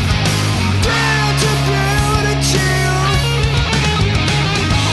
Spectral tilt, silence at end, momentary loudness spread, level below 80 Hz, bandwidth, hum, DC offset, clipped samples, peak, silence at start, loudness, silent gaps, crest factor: -4.5 dB/octave; 0 s; 1 LU; -24 dBFS; 12.5 kHz; none; under 0.1%; under 0.1%; -2 dBFS; 0 s; -14 LUFS; none; 12 dB